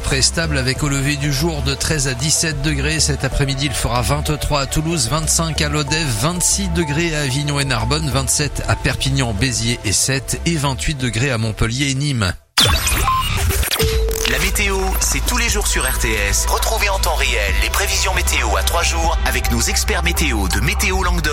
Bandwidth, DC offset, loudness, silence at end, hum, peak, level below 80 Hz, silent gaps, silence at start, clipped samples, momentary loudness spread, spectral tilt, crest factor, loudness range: 16.5 kHz; under 0.1%; -17 LUFS; 0 s; none; 0 dBFS; -24 dBFS; none; 0 s; under 0.1%; 3 LU; -3 dB/octave; 16 dB; 1 LU